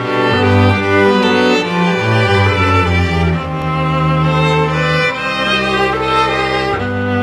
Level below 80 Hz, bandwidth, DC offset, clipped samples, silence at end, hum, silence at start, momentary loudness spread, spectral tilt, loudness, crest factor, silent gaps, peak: -32 dBFS; 11.5 kHz; under 0.1%; under 0.1%; 0 s; none; 0 s; 5 LU; -6 dB/octave; -13 LUFS; 12 dB; none; 0 dBFS